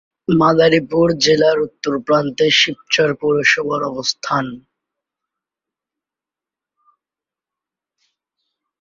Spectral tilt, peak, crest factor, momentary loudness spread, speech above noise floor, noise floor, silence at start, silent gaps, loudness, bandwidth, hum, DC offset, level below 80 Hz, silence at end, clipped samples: -4 dB/octave; 0 dBFS; 18 dB; 8 LU; 72 dB; -88 dBFS; 0.3 s; none; -15 LUFS; 7.6 kHz; none; under 0.1%; -54 dBFS; 4.25 s; under 0.1%